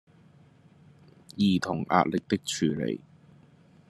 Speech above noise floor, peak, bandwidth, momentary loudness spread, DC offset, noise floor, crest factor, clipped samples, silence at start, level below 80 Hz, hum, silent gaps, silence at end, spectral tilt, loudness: 30 dB; -4 dBFS; 12.5 kHz; 9 LU; under 0.1%; -57 dBFS; 26 dB; under 0.1%; 1.35 s; -66 dBFS; none; none; 0.9 s; -5.5 dB/octave; -27 LUFS